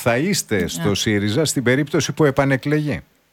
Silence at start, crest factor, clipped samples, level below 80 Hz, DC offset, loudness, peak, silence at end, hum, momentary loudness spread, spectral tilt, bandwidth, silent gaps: 0 s; 16 dB; under 0.1%; -48 dBFS; under 0.1%; -19 LUFS; -4 dBFS; 0.3 s; none; 4 LU; -4.5 dB/octave; 18 kHz; none